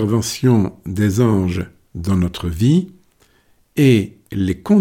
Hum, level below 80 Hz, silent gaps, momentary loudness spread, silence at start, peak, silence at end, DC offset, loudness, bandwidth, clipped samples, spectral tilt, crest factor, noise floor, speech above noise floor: none; -40 dBFS; none; 12 LU; 0 s; -4 dBFS; 0 s; under 0.1%; -18 LUFS; 17 kHz; under 0.1%; -7 dB/octave; 14 dB; -57 dBFS; 41 dB